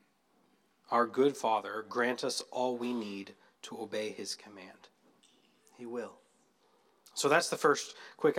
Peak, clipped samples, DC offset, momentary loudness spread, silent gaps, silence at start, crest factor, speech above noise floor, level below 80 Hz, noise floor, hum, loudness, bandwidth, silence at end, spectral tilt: -12 dBFS; under 0.1%; under 0.1%; 20 LU; none; 0.9 s; 22 dB; 38 dB; under -90 dBFS; -71 dBFS; none; -33 LUFS; 16 kHz; 0 s; -3 dB/octave